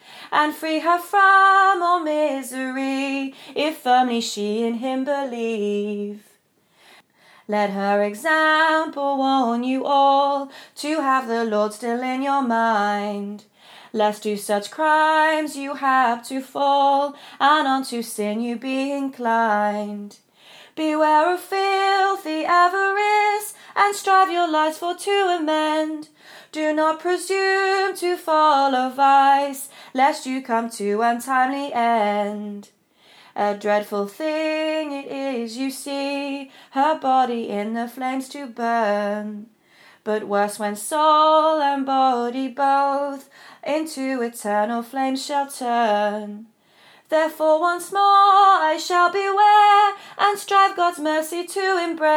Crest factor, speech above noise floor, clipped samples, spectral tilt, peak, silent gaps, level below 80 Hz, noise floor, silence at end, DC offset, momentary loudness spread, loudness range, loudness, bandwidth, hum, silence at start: 18 dB; 40 dB; under 0.1%; -3.5 dB/octave; -4 dBFS; none; -84 dBFS; -60 dBFS; 0 s; under 0.1%; 12 LU; 6 LU; -20 LUFS; 20 kHz; none; 0.1 s